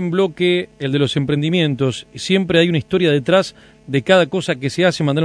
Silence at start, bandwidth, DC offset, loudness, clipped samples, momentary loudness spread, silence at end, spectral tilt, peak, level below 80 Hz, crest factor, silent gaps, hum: 0 s; 11 kHz; under 0.1%; -17 LUFS; under 0.1%; 7 LU; 0 s; -6 dB/octave; 0 dBFS; -52 dBFS; 16 dB; none; none